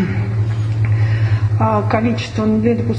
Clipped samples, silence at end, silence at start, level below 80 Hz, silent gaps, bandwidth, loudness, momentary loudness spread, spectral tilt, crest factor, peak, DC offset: under 0.1%; 0 s; 0 s; -38 dBFS; none; 7.2 kHz; -17 LUFS; 3 LU; -8.5 dB/octave; 16 dB; 0 dBFS; under 0.1%